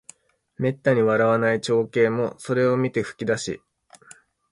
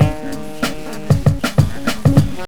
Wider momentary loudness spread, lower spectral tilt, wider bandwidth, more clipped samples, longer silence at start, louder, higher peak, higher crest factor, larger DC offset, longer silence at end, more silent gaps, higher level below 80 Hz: second, 8 LU vs 12 LU; about the same, -6 dB/octave vs -6.5 dB/octave; second, 11.5 kHz vs 19 kHz; neither; first, 0.6 s vs 0 s; second, -22 LUFS vs -17 LUFS; second, -6 dBFS vs 0 dBFS; about the same, 16 dB vs 16 dB; second, under 0.1% vs 5%; first, 0.95 s vs 0 s; neither; second, -62 dBFS vs -32 dBFS